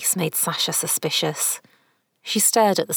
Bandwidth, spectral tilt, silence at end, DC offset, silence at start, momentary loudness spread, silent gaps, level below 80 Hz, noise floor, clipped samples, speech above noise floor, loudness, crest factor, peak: over 20 kHz; -2 dB/octave; 0 s; under 0.1%; 0 s; 9 LU; none; -74 dBFS; -64 dBFS; under 0.1%; 43 dB; -20 LUFS; 16 dB; -6 dBFS